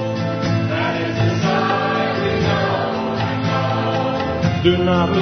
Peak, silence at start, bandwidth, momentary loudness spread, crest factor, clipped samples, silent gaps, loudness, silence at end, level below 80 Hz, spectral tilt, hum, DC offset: -2 dBFS; 0 s; 6.4 kHz; 4 LU; 16 dB; under 0.1%; none; -19 LUFS; 0 s; -42 dBFS; -6.5 dB/octave; none; under 0.1%